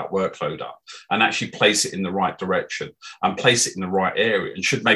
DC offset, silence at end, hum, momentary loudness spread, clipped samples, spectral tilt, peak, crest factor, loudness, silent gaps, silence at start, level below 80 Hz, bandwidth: under 0.1%; 0 s; none; 13 LU; under 0.1%; -3 dB/octave; -2 dBFS; 20 dB; -21 LUFS; none; 0 s; -58 dBFS; 13 kHz